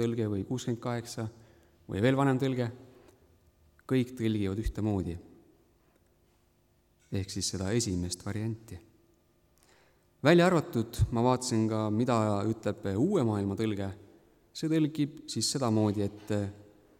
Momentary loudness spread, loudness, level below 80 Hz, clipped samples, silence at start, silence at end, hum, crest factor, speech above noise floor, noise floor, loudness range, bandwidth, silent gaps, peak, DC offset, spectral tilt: 12 LU; -30 LUFS; -50 dBFS; under 0.1%; 0 s; 0.35 s; none; 22 dB; 39 dB; -68 dBFS; 8 LU; 16 kHz; none; -10 dBFS; under 0.1%; -6 dB/octave